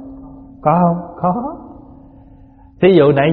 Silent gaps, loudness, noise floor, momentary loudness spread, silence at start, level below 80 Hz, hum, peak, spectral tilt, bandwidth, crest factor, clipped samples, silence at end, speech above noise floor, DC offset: none; -14 LUFS; -43 dBFS; 24 LU; 0 s; -46 dBFS; none; 0 dBFS; -6.5 dB/octave; 4.2 kHz; 16 dB; under 0.1%; 0 s; 30 dB; under 0.1%